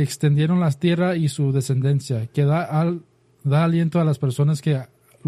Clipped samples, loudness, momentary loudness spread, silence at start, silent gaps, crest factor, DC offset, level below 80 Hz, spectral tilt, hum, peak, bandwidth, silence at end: under 0.1%; -21 LUFS; 6 LU; 0 s; none; 12 dB; under 0.1%; -58 dBFS; -7.5 dB/octave; none; -8 dBFS; 13 kHz; 0 s